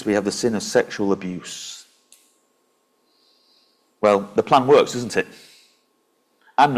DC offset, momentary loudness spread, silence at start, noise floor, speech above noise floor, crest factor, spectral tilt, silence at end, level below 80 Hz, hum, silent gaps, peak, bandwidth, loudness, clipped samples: under 0.1%; 17 LU; 0 s; -66 dBFS; 46 dB; 20 dB; -4.5 dB/octave; 0 s; -60 dBFS; none; none; -4 dBFS; 15 kHz; -20 LUFS; under 0.1%